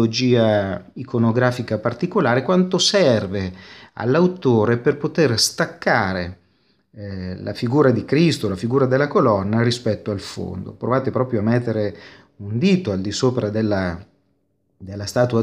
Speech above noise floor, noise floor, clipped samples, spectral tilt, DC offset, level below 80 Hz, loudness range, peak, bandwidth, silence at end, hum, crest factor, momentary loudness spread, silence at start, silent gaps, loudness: 48 dB; -67 dBFS; under 0.1%; -5.5 dB/octave; under 0.1%; -54 dBFS; 4 LU; -2 dBFS; 15 kHz; 0 s; none; 18 dB; 13 LU; 0 s; none; -19 LUFS